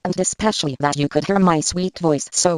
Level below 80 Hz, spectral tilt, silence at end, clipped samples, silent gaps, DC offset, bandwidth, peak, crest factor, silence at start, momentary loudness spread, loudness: -46 dBFS; -4 dB/octave; 0 s; under 0.1%; none; under 0.1%; 12 kHz; -2 dBFS; 18 dB; 0.05 s; 5 LU; -19 LUFS